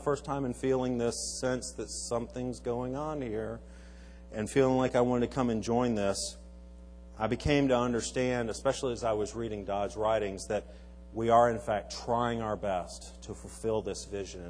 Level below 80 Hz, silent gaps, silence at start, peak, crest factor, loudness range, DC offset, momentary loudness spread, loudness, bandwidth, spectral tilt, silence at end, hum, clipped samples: -50 dBFS; none; 0 s; -12 dBFS; 20 dB; 3 LU; under 0.1%; 18 LU; -31 LUFS; 10.5 kHz; -5 dB/octave; 0 s; none; under 0.1%